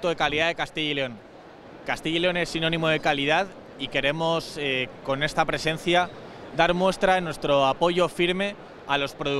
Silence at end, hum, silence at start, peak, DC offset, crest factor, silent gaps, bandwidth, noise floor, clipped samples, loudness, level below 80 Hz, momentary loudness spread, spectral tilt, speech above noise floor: 0 s; none; 0 s; -4 dBFS; under 0.1%; 20 dB; none; 14 kHz; -45 dBFS; under 0.1%; -24 LUFS; -50 dBFS; 10 LU; -4.5 dB/octave; 21 dB